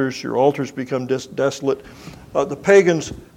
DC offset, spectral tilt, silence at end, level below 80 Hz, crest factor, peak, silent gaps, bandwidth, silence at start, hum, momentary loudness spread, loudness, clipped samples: under 0.1%; -5.5 dB/octave; 0.1 s; -52 dBFS; 18 dB; -2 dBFS; none; 13 kHz; 0 s; none; 13 LU; -19 LUFS; under 0.1%